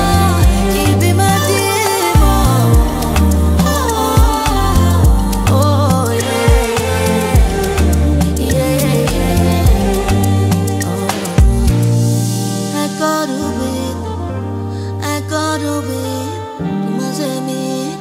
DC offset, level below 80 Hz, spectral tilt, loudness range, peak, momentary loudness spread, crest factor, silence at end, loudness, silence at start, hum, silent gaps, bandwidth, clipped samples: under 0.1%; -18 dBFS; -5.5 dB/octave; 7 LU; 0 dBFS; 8 LU; 12 dB; 0 s; -14 LUFS; 0 s; none; none; 16.5 kHz; under 0.1%